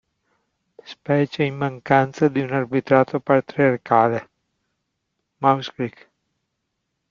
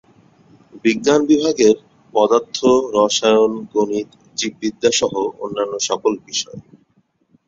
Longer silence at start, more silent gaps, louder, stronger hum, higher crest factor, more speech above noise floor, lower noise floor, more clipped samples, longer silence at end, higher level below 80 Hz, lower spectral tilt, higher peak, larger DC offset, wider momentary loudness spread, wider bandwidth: first, 0.9 s vs 0.75 s; neither; second, -20 LUFS vs -17 LUFS; neither; about the same, 20 dB vs 18 dB; first, 57 dB vs 44 dB; first, -77 dBFS vs -61 dBFS; neither; first, 1.2 s vs 0.9 s; about the same, -62 dBFS vs -58 dBFS; first, -7.5 dB/octave vs -3.5 dB/octave; about the same, -2 dBFS vs 0 dBFS; neither; first, 12 LU vs 9 LU; about the same, 7.4 kHz vs 7.8 kHz